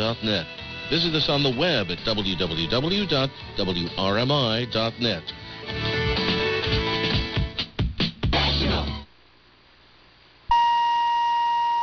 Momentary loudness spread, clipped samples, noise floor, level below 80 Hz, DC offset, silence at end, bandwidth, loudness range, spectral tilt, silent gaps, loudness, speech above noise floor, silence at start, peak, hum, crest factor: 8 LU; under 0.1%; -55 dBFS; -38 dBFS; under 0.1%; 0 s; 6.8 kHz; 2 LU; -5.5 dB/octave; none; -23 LUFS; 31 dB; 0 s; -10 dBFS; none; 14 dB